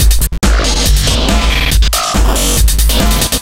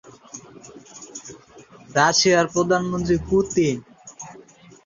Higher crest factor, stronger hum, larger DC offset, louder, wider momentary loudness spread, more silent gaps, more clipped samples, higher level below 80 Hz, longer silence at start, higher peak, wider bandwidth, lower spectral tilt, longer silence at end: second, 10 dB vs 20 dB; neither; first, 3% vs under 0.1%; first, -11 LUFS vs -20 LUFS; second, 1 LU vs 24 LU; neither; neither; first, -12 dBFS vs -48 dBFS; about the same, 0 s vs 0.05 s; first, 0 dBFS vs -4 dBFS; first, 17 kHz vs 7.6 kHz; about the same, -3.5 dB/octave vs -4 dB/octave; second, 0 s vs 0.55 s